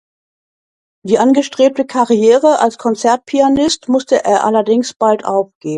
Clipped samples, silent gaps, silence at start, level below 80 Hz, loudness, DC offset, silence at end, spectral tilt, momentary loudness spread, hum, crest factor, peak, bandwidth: under 0.1%; 4.96-5.00 s, 5.55-5.61 s; 1.05 s; -54 dBFS; -13 LUFS; under 0.1%; 0 s; -4.5 dB/octave; 6 LU; none; 14 dB; 0 dBFS; 11 kHz